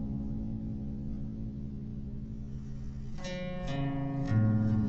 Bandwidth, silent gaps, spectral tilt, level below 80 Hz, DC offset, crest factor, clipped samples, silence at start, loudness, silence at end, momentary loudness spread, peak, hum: 7.2 kHz; none; -8 dB/octave; -44 dBFS; under 0.1%; 16 dB; under 0.1%; 0 s; -36 LUFS; 0 s; 14 LU; -18 dBFS; none